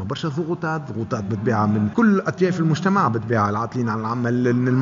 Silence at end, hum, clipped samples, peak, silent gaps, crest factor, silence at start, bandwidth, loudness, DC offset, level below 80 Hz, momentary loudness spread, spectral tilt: 0 s; none; under 0.1%; -4 dBFS; none; 16 dB; 0 s; 7.6 kHz; -21 LUFS; under 0.1%; -58 dBFS; 7 LU; -7.5 dB/octave